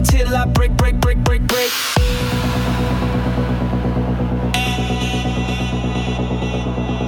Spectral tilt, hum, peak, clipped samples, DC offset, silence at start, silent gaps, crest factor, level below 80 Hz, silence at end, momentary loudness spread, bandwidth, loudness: -5.5 dB/octave; none; -4 dBFS; under 0.1%; under 0.1%; 0 s; none; 14 dB; -22 dBFS; 0 s; 4 LU; 18 kHz; -18 LUFS